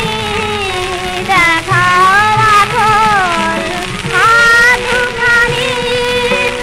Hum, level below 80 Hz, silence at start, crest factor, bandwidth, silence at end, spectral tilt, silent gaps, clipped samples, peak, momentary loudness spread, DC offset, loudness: none; -32 dBFS; 0 s; 10 dB; 16 kHz; 0 s; -3 dB/octave; none; under 0.1%; -2 dBFS; 9 LU; under 0.1%; -10 LUFS